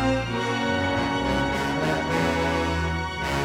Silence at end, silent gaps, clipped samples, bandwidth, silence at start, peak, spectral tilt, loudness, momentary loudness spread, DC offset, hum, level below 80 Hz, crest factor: 0 s; none; under 0.1%; 17 kHz; 0 s; -12 dBFS; -5.5 dB/octave; -24 LUFS; 3 LU; under 0.1%; none; -38 dBFS; 12 dB